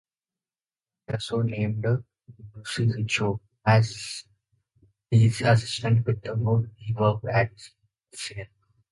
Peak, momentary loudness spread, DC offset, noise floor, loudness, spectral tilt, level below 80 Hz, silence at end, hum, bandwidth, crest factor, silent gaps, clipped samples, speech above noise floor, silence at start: -6 dBFS; 14 LU; under 0.1%; under -90 dBFS; -25 LUFS; -6 dB/octave; -54 dBFS; 0.45 s; none; 11.5 kHz; 20 dB; none; under 0.1%; over 66 dB; 1.1 s